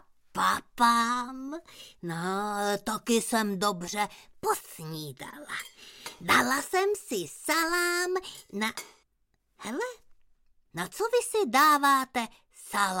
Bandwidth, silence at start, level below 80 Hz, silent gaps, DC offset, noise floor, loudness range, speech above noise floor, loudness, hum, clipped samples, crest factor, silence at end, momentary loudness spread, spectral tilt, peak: 17 kHz; 0.35 s; -64 dBFS; none; under 0.1%; -73 dBFS; 5 LU; 45 dB; -28 LUFS; none; under 0.1%; 20 dB; 0 s; 17 LU; -3 dB/octave; -10 dBFS